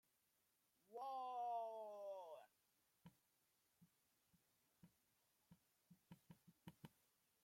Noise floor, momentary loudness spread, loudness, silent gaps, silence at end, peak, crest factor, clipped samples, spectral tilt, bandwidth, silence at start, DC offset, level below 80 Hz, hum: -85 dBFS; 20 LU; -52 LUFS; none; 0.55 s; -40 dBFS; 18 dB; under 0.1%; -5.5 dB/octave; 16.5 kHz; 0.9 s; under 0.1%; under -90 dBFS; none